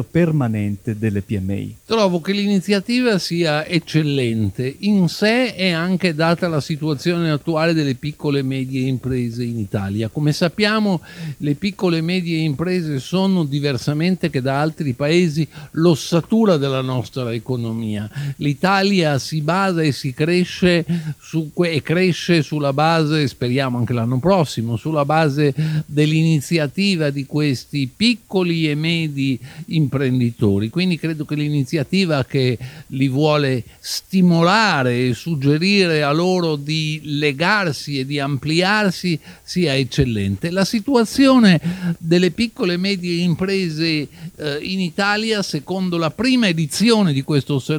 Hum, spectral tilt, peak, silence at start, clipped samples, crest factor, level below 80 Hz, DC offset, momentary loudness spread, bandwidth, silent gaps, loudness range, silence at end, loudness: none; -6 dB/octave; -2 dBFS; 0 s; under 0.1%; 16 dB; -50 dBFS; under 0.1%; 8 LU; 19 kHz; none; 3 LU; 0 s; -19 LUFS